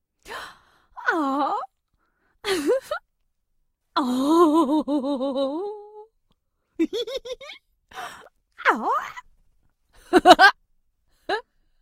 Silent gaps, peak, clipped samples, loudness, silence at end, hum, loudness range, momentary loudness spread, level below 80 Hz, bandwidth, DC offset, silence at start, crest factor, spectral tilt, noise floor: none; 0 dBFS; under 0.1%; -21 LUFS; 0.4 s; none; 9 LU; 22 LU; -58 dBFS; 16 kHz; under 0.1%; 0.25 s; 24 dB; -3 dB/octave; -71 dBFS